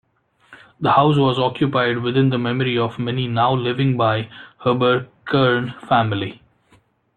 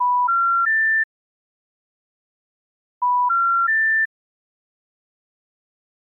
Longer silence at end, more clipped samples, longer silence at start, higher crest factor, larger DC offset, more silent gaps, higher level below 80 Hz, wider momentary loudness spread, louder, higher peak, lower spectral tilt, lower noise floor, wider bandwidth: second, 0.85 s vs 1.95 s; neither; first, 0.5 s vs 0 s; first, 16 dB vs 8 dB; neither; second, none vs 1.04-3.01 s; first, -56 dBFS vs under -90 dBFS; about the same, 8 LU vs 7 LU; about the same, -19 LUFS vs -18 LUFS; first, -2 dBFS vs -14 dBFS; first, -8.5 dB/octave vs 18.5 dB/octave; second, -57 dBFS vs under -90 dBFS; first, 4.6 kHz vs 2.2 kHz